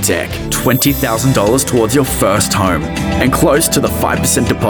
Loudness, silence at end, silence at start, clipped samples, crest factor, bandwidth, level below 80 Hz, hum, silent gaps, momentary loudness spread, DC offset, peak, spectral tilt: -13 LUFS; 0 s; 0 s; under 0.1%; 12 dB; 19.5 kHz; -30 dBFS; none; none; 5 LU; under 0.1%; 0 dBFS; -4.5 dB/octave